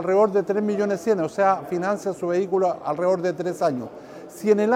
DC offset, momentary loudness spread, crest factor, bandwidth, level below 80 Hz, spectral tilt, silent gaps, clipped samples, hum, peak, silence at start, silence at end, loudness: under 0.1%; 7 LU; 16 dB; 15.5 kHz; -66 dBFS; -6.5 dB/octave; none; under 0.1%; none; -6 dBFS; 0 s; 0 s; -23 LUFS